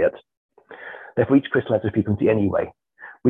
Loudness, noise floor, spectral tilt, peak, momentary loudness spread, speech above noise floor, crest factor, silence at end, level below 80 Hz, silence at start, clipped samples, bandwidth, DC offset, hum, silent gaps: -21 LUFS; -40 dBFS; -10 dB/octave; -4 dBFS; 19 LU; 20 dB; 18 dB; 0 s; -48 dBFS; 0 s; under 0.1%; 3.8 kHz; under 0.1%; none; 0.37-0.49 s